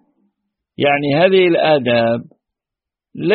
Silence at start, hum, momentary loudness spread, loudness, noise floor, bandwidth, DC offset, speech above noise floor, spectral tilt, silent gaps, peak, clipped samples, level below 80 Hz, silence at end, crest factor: 0.8 s; none; 9 LU; -14 LUFS; -86 dBFS; 4.8 kHz; under 0.1%; 72 dB; -4 dB/octave; none; 0 dBFS; under 0.1%; -58 dBFS; 0 s; 16 dB